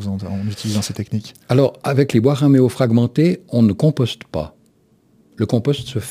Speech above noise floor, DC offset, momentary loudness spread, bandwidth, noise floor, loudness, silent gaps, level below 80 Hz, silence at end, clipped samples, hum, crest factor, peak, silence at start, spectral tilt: 39 dB; under 0.1%; 12 LU; 15.5 kHz; -56 dBFS; -18 LUFS; none; -50 dBFS; 0 s; under 0.1%; none; 16 dB; 0 dBFS; 0 s; -7 dB/octave